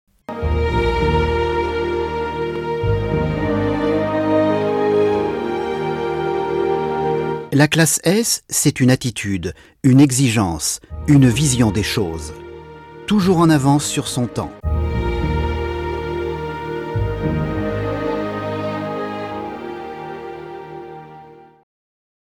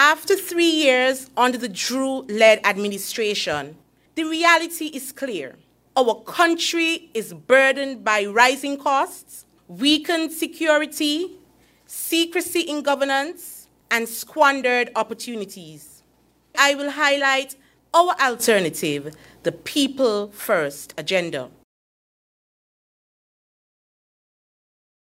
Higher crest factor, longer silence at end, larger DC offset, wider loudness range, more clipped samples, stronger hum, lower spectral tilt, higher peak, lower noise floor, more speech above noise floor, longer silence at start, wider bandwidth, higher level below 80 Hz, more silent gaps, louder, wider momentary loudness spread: second, 14 dB vs 22 dB; second, 0.8 s vs 3.55 s; neither; first, 8 LU vs 5 LU; neither; neither; first, -5 dB/octave vs -2.5 dB/octave; second, -4 dBFS vs 0 dBFS; second, -42 dBFS vs -60 dBFS; second, 26 dB vs 40 dB; first, 0.3 s vs 0 s; about the same, 15.5 kHz vs 16 kHz; first, -32 dBFS vs -66 dBFS; neither; about the same, -18 LUFS vs -20 LUFS; about the same, 16 LU vs 14 LU